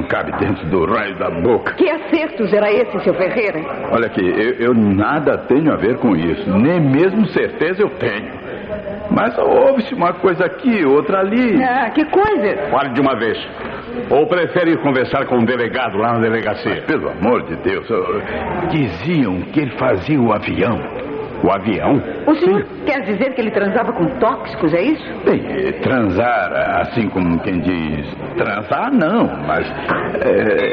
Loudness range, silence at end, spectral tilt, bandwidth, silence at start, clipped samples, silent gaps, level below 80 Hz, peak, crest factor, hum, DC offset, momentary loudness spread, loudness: 3 LU; 0 s; -9 dB/octave; 5.6 kHz; 0 s; under 0.1%; none; -44 dBFS; 0 dBFS; 16 dB; none; under 0.1%; 6 LU; -16 LUFS